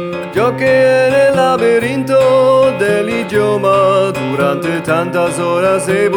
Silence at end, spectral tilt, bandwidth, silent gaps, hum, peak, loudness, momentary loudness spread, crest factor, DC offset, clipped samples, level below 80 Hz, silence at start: 0 s; -5.5 dB/octave; 17.5 kHz; none; none; -2 dBFS; -12 LUFS; 5 LU; 10 dB; under 0.1%; under 0.1%; -50 dBFS; 0 s